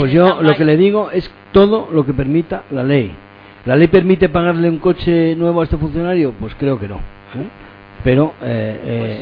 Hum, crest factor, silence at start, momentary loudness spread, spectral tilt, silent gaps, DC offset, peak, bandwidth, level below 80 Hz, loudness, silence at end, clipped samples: none; 14 dB; 0 s; 13 LU; -10.5 dB/octave; none; under 0.1%; 0 dBFS; 5.2 kHz; -34 dBFS; -14 LUFS; 0 s; under 0.1%